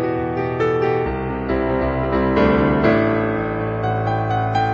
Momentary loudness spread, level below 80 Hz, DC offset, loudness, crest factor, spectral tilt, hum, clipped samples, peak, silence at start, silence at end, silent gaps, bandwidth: 6 LU; -34 dBFS; under 0.1%; -19 LUFS; 14 dB; -8.5 dB/octave; none; under 0.1%; -4 dBFS; 0 s; 0 s; none; 7 kHz